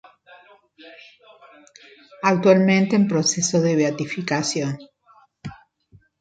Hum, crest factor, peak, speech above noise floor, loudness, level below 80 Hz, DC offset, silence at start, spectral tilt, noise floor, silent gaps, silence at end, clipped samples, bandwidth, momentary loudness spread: none; 20 dB; -4 dBFS; 37 dB; -19 LUFS; -64 dBFS; under 0.1%; 0.85 s; -4.5 dB/octave; -56 dBFS; none; 0.65 s; under 0.1%; 9.2 kHz; 23 LU